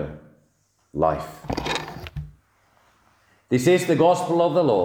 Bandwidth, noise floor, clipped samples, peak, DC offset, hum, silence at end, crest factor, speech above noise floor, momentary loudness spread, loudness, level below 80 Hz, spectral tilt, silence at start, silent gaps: over 20 kHz; -66 dBFS; under 0.1%; -6 dBFS; under 0.1%; none; 0 s; 18 dB; 46 dB; 17 LU; -21 LUFS; -48 dBFS; -6 dB/octave; 0 s; none